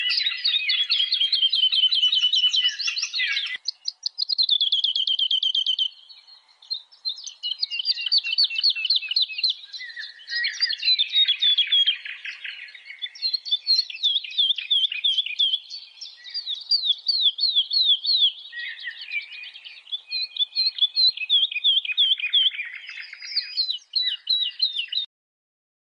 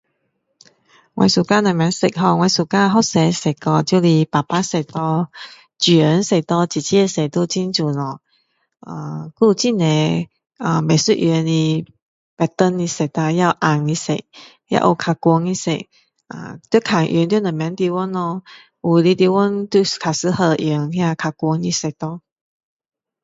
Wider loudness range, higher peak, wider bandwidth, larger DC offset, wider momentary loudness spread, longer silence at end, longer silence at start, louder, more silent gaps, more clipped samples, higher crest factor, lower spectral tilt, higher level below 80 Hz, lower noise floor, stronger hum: about the same, 3 LU vs 4 LU; second, -10 dBFS vs 0 dBFS; first, 10.5 kHz vs 8 kHz; neither; first, 15 LU vs 11 LU; second, 0.8 s vs 1.05 s; second, 0 s vs 1.15 s; second, -20 LUFS vs -17 LUFS; second, none vs 12.02-12.37 s; neither; about the same, 14 dB vs 18 dB; second, 7 dB/octave vs -5.5 dB/octave; second, under -90 dBFS vs -58 dBFS; second, -52 dBFS vs -70 dBFS; neither